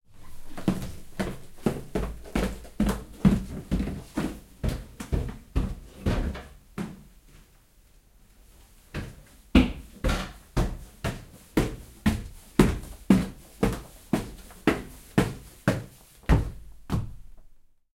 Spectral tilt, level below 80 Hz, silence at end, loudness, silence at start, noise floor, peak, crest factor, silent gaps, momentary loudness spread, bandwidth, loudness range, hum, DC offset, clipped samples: -6.5 dB/octave; -36 dBFS; 0.45 s; -29 LUFS; 0.1 s; -58 dBFS; -4 dBFS; 26 dB; none; 15 LU; 16.5 kHz; 7 LU; none; under 0.1%; under 0.1%